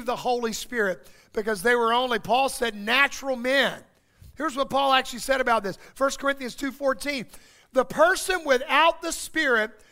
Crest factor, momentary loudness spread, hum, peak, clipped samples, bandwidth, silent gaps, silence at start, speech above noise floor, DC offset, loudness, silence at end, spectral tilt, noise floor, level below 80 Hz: 20 dB; 10 LU; none; -4 dBFS; under 0.1%; 16 kHz; none; 0 s; 28 dB; under 0.1%; -24 LUFS; 0.2 s; -2.5 dB/octave; -52 dBFS; -52 dBFS